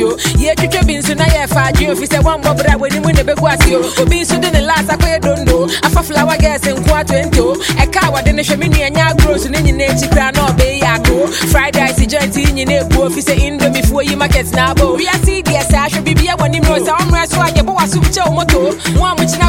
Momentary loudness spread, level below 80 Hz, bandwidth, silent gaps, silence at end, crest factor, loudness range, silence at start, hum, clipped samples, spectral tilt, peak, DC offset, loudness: 2 LU; -18 dBFS; 17 kHz; none; 0 s; 10 dB; 1 LU; 0 s; none; under 0.1%; -4.5 dB/octave; 0 dBFS; under 0.1%; -12 LUFS